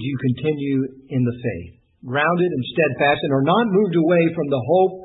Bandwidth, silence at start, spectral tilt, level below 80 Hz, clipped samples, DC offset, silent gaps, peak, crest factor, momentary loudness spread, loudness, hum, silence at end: 4.1 kHz; 0 s; -12 dB/octave; -58 dBFS; under 0.1%; under 0.1%; none; -4 dBFS; 14 dB; 8 LU; -20 LUFS; none; 0 s